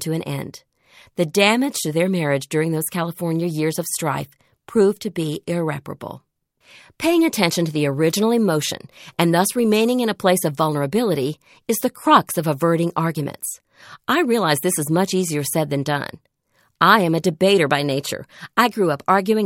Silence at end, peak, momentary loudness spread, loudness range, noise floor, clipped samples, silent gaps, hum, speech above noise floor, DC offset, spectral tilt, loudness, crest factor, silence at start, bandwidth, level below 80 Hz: 0 s; 0 dBFS; 13 LU; 4 LU; -64 dBFS; under 0.1%; none; none; 44 dB; under 0.1%; -4.5 dB/octave; -20 LUFS; 20 dB; 0 s; 17 kHz; -62 dBFS